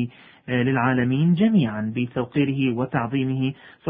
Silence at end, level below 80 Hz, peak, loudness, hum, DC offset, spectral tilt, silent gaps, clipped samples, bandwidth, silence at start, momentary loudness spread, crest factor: 0 s; -56 dBFS; -6 dBFS; -22 LUFS; none; under 0.1%; -12 dB/octave; none; under 0.1%; 3.8 kHz; 0 s; 8 LU; 16 dB